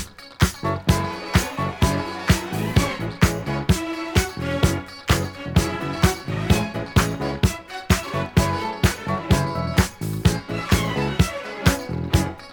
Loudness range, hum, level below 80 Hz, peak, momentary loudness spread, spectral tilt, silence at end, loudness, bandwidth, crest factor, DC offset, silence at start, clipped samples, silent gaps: 1 LU; none; -32 dBFS; -2 dBFS; 4 LU; -5 dB/octave; 0 s; -22 LUFS; over 20 kHz; 20 dB; under 0.1%; 0 s; under 0.1%; none